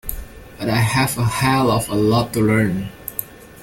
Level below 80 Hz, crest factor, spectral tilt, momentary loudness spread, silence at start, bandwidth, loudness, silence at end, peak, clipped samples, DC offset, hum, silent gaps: -40 dBFS; 18 dB; -5.5 dB/octave; 11 LU; 0.05 s; 17 kHz; -19 LUFS; 0 s; -2 dBFS; under 0.1%; under 0.1%; none; none